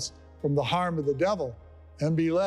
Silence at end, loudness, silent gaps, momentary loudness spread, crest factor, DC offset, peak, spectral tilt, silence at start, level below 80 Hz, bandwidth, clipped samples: 0 s; -28 LUFS; none; 9 LU; 14 dB; under 0.1%; -14 dBFS; -6 dB/octave; 0 s; -56 dBFS; 12 kHz; under 0.1%